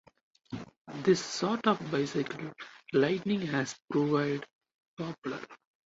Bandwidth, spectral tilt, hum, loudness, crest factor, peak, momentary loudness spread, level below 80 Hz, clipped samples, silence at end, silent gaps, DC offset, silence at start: 8 kHz; -5.5 dB/octave; none; -31 LUFS; 20 dB; -12 dBFS; 16 LU; -70 dBFS; under 0.1%; 0.3 s; 0.77-0.85 s, 4.55-4.61 s, 4.74-4.79 s, 4.88-4.97 s, 5.18-5.22 s; under 0.1%; 0.5 s